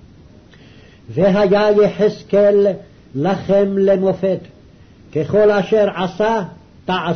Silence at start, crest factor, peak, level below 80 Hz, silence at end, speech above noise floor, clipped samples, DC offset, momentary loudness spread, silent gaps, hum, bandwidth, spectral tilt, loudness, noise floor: 1.1 s; 12 dB; -6 dBFS; -48 dBFS; 0 s; 29 dB; under 0.1%; 0.3%; 13 LU; none; none; 6.6 kHz; -7.5 dB/octave; -16 LUFS; -44 dBFS